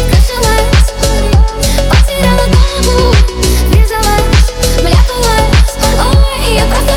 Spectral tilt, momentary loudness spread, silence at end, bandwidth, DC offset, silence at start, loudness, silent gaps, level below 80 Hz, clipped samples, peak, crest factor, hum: -4.5 dB/octave; 3 LU; 0 s; 17 kHz; under 0.1%; 0 s; -10 LUFS; none; -10 dBFS; under 0.1%; 0 dBFS; 8 dB; none